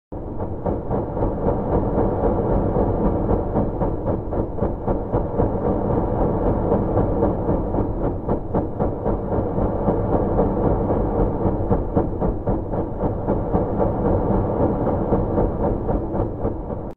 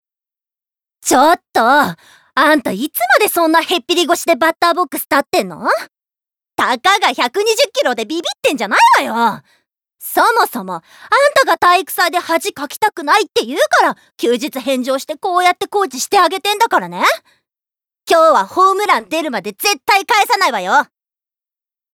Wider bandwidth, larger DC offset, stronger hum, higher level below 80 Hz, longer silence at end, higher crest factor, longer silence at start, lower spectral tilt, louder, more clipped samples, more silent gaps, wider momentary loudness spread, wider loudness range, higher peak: second, 3.4 kHz vs over 20 kHz; neither; neither; first, -28 dBFS vs -64 dBFS; second, 0 s vs 1.1 s; about the same, 16 dB vs 12 dB; second, 0.1 s vs 1.05 s; first, -12.5 dB/octave vs -2 dB/octave; second, -22 LUFS vs -14 LUFS; neither; neither; second, 5 LU vs 8 LU; about the same, 1 LU vs 2 LU; second, -6 dBFS vs -2 dBFS